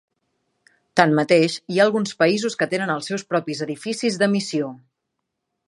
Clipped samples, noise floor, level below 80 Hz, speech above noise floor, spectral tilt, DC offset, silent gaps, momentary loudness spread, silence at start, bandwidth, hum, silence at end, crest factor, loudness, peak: under 0.1%; -79 dBFS; -70 dBFS; 59 dB; -5 dB/octave; under 0.1%; none; 9 LU; 0.95 s; 11.5 kHz; none; 0.9 s; 22 dB; -21 LUFS; 0 dBFS